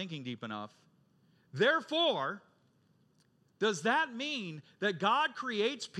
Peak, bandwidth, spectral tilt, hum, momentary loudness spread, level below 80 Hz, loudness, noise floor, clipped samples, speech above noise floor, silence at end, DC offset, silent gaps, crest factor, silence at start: -16 dBFS; 11.5 kHz; -4 dB/octave; none; 14 LU; under -90 dBFS; -32 LUFS; -70 dBFS; under 0.1%; 37 dB; 0 s; under 0.1%; none; 18 dB; 0 s